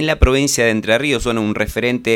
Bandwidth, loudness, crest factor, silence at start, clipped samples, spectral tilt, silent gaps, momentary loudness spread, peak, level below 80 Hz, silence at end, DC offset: 17.5 kHz; -16 LUFS; 16 dB; 0 s; under 0.1%; -4.5 dB/octave; none; 5 LU; 0 dBFS; -24 dBFS; 0 s; under 0.1%